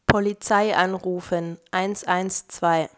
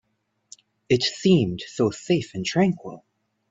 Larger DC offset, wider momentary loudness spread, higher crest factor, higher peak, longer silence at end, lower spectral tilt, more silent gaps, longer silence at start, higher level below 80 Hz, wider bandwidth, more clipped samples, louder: neither; about the same, 8 LU vs 8 LU; about the same, 22 dB vs 18 dB; first, -2 dBFS vs -6 dBFS; second, 0.1 s vs 0.5 s; about the same, -4.5 dB/octave vs -5.5 dB/octave; neither; second, 0.1 s vs 0.9 s; first, -46 dBFS vs -60 dBFS; about the same, 8 kHz vs 7.8 kHz; neither; about the same, -23 LUFS vs -23 LUFS